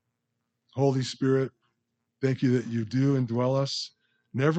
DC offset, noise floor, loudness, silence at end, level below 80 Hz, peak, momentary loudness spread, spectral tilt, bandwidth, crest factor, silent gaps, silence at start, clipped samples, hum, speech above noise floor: under 0.1%; -81 dBFS; -27 LUFS; 0 s; -72 dBFS; -10 dBFS; 9 LU; -6.5 dB/octave; 8.6 kHz; 18 dB; none; 0.75 s; under 0.1%; none; 55 dB